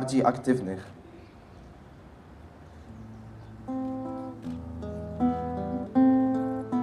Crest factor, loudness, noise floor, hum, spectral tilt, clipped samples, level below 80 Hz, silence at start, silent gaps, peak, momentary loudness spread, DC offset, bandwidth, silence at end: 22 dB; -29 LUFS; -49 dBFS; none; -7.5 dB/octave; under 0.1%; -52 dBFS; 0 s; none; -8 dBFS; 26 LU; under 0.1%; 10.5 kHz; 0 s